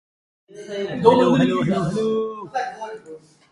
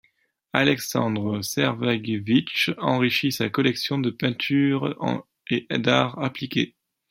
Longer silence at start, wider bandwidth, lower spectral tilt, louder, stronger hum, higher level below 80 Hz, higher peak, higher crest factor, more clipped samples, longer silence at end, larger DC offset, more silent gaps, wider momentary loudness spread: about the same, 0.55 s vs 0.55 s; second, 11.5 kHz vs 16.5 kHz; first, -7 dB/octave vs -5 dB/octave; first, -20 LUFS vs -24 LUFS; neither; first, -56 dBFS vs -64 dBFS; about the same, 0 dBFS vs -2 dBFS; about the same, 22 dB vs 22 dB; neither; about the same, 0.35 s vs 0.45 s; neither; neither; first, 19 LU vs 7 LU